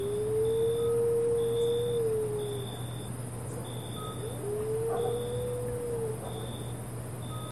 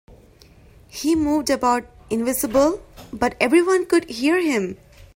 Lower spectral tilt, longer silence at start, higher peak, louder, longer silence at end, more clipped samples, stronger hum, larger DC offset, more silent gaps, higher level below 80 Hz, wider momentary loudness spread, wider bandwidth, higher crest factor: first, -6 dB/octave vs -4 dB/octave; second, 0 s vs 0.95 s; second, -20 dBFS vs -2 dBFS; second, -32 LUFS vs -20 LUFS; second, 0 s vs 0.4 s; neither; neither; first, 0.2% vs under 0.1%; neither; about the same, -52 dBFS vs -48 dBFS; second, 10 LU vs 13 LU; second, 13.5 kHz vs 16.5 kHz; second, 12 dB vs 20 dB